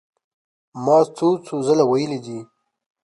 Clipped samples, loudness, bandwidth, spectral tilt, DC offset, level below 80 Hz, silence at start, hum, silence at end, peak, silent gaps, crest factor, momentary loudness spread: under 0.1%; -19 LUFS; 11.5 kHz; -6.5 dB/octave; under 0.1%; -70 dBFS; 0.75 s; none; 0.6 s; -4 dBFS; none; 18 dB; 14 LU